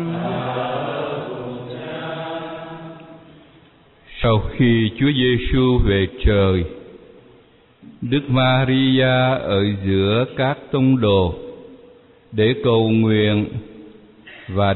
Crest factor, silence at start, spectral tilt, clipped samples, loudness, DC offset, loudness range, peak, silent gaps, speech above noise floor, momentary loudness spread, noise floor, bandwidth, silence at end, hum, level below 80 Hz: 14 dB; 0 s; -5.5 dB/octave; under 0.1%; -19 LUFS; under 0.1%; 9 LU; -6 dBFS; none; 34 dB; 16 LU; -51 dBFS; 4.2 kHz; 0 s; none; -34 dBFS